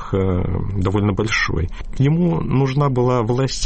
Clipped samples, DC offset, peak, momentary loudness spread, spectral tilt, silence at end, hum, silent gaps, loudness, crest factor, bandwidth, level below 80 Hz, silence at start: under 0.1%; under 0.1%; -6 dBFS; 5 LU; -6.5 dB/octave; 0 s; none; none; -19 LUFS; 12 dB; 8.8 kHz; -32 dBFS; 0 s